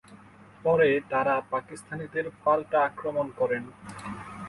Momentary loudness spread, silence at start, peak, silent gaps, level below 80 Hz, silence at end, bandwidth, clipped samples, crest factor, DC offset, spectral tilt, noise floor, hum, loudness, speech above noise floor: 16 LU; 0.1 s; -10 dBFS; none; -62 dBFS; 0 s; 11.5 kHz; under 0.1%; 18 dB; under 0.1%; -6 dB/octave; -51 dBFS; none; -27 LUFS; 25 dB